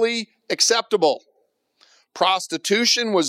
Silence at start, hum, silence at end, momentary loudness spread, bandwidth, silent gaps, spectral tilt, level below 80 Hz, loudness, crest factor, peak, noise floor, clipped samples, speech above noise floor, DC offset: 0 s; none; 0 s; 10 LU; 16 kHz; none; -1.5 dB/octave; -80 dBFS; -20 LUFS; 16 dB; -6 dBFS; -67 dBFS; under 0.1%; 47 dB; under 0.1%